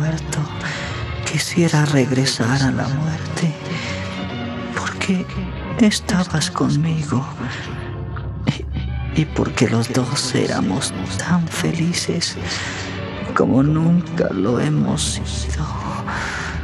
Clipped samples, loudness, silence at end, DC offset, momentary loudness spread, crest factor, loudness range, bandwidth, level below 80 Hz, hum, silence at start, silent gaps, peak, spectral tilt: under 0.1%; -20 LUFS; 0 s; under 0.1%; 10 LU; 18 dB; 3 LU; 13.5 kHz; -36 dBFS; none; 0 s; none; -2 dBFS; -5 dB/octave